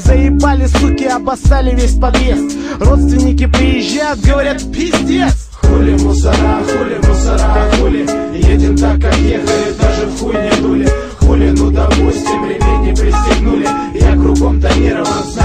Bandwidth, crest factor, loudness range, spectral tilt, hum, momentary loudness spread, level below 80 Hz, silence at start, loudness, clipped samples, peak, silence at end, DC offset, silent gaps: 10 kHz; 10 dB; 1 LU; -6 dB/octave; none; 5 LU; -12 dBFS; 0 s; -12 LUFS; under 0.1%; 0 dBFS; 0 s; under 0.1%; none